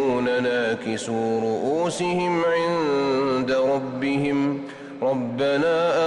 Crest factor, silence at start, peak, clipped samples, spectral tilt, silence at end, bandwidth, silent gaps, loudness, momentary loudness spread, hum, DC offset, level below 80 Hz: 10 dB; 0 s; -12 dBFS; under 0.1%; -5.5 dB/octave; 0 s; 11.5 kHz; none; -23 LUFS; 5 LU; none; under 0.1%; -60 dBFS